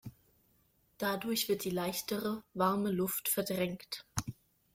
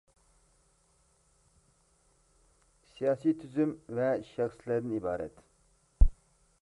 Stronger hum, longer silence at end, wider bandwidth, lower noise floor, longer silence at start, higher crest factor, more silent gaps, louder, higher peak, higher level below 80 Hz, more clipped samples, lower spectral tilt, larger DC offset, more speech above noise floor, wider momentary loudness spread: neither; about the same, 0.45 s vs 0.5 s; first, 16.5 kHz vs 10.5 kHz; about the same, -71 dBFS vs -69 dBFS; second, 0.05 s vs 3 s; about the same, 22 dB vs 26 dB; neither; about the same, -35 LUFS vs -33 LUFS; second, -14 dBFS vs -8 dBFS; second, -64 dBFS vs -38 dBFS; neither; second, -4 dB/octave vs -8.5 dB/octave; neither; about the same, 37 dB vs 37 dB; first, 9 LU vs 5 LU